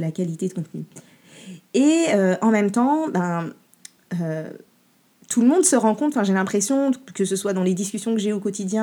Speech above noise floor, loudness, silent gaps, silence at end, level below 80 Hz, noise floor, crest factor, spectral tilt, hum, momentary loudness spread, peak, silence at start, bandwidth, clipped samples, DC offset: 39 dB; -21 LUFS; none; 0 s; -78 dBFS; -60 dBFS; 18 dB; -5 dB/octave; none; 14 LU; -4 dBFS; 0 s; 19 kHz; under 0.1%; under 0.1%